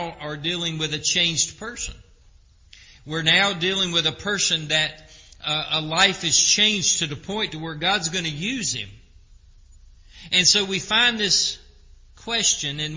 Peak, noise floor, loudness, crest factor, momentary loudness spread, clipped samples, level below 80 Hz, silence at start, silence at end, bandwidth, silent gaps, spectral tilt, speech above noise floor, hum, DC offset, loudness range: -2 dBFS; -53 dBFS; -20 LUFS; 22 dB; 14 LU; under 0.1%; -50 dBFS; 0 s; 0 s; 7.8 kHz; none; -1.5 dB/octave; 30 dB; none; under 0.1%; 5 LU